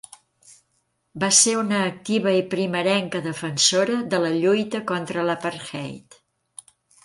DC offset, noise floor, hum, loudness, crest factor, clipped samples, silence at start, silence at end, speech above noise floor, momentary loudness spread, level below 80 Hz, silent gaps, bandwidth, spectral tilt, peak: under 0.1%; -71 dBFS; none; -21 LUFS; 22 dB; under 0.1%; 1.15 s; 1.05 s; 49 dB; 13 LU; -68 dBFS; none; 11.5 kHz; -3 dB/octave; -2 dBFS